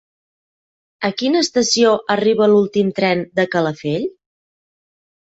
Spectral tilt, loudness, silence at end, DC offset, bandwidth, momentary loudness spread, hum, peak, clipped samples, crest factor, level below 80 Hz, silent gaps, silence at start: -4.5 dB/octave; -17 LUFS; 1.3 s; under 0.1%; 8.2 kHz; 9 LU; none; -2 dBFS; under 0.1%; 16 dB; -60 dBFS; none; 1 s